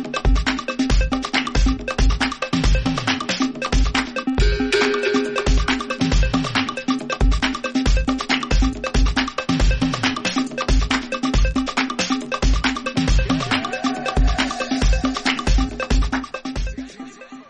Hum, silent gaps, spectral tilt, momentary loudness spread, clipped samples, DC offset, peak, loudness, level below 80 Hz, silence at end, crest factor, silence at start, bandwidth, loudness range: none; none; -4.5 dB/octave; 3 LU; under 0.1%; under 0.1%; -6 dBFS; -21 LUFS; -22 dBFS; 0.05 s; 14 dB; 0 s; 9.8 kHz; 1 LU